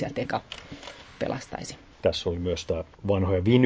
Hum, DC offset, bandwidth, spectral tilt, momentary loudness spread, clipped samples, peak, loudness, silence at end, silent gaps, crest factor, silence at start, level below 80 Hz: none; under 0.1%; 8 kHz; -6.5 dB/octave; 16 LU; under 0.1%; -6 dBFS; -29 LUFS; 0 s; none; 22 dB; 0 s; -44 dBFS